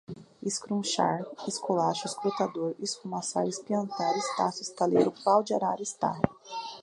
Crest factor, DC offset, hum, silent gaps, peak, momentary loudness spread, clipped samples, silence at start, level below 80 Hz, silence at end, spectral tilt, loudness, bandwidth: 24 dB; under 0.1%; none; none; -6 dBFS; 9 LU; under 0.1%; 0.1 s; -64 dBFS; 0 s; -4.5 dB/octave; -29 LUFS; 11.5 kHz